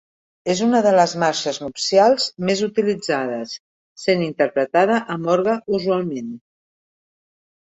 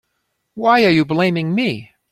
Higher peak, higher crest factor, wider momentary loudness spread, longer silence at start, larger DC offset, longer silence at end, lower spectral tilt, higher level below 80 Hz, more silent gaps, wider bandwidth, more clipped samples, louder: about the same, -2 dBFS vs -2 dBFS; about the same, 18 dB vs 16 dB; first, 13 LU vs 9 LU; about the same, 0.45 s vs 0.55 s; neither; first, 1.25 s vs 0.25 s; second, -4.5 dB/octave vs -7 dB/octave; second, -64 dBFS vs -56 dBFS; first, 3.60-3.96 s vs none; second, 8.4 kHz vs 14.5 kHz; neither; second, -19 LUFS vs -16 LUFS